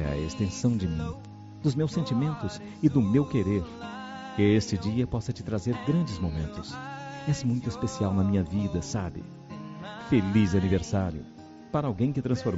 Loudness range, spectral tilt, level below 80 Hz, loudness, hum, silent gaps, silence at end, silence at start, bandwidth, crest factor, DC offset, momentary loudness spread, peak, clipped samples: 3 LU; -7.5 dB/octave; -48 dBFS; -28 LUFS; none; none; 0 s; 0 s; 8 kHz; 18 dB; under 0.1%; 15 LU; -10 dBFS; under 0.1%